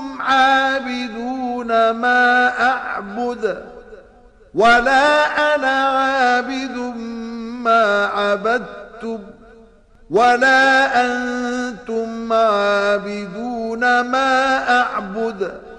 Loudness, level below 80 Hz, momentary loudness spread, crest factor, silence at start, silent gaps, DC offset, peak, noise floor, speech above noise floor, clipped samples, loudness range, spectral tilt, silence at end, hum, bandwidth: -17 LUFS; -50 dBFS; 14 LU; 12 dB; 0 s; none; under 0.1%; -6 dBFS; -47 dBFS; 30 dB; under 0.1%; 3 LU; -3.5 dB/octave; 0 s; none; 10.5 kHz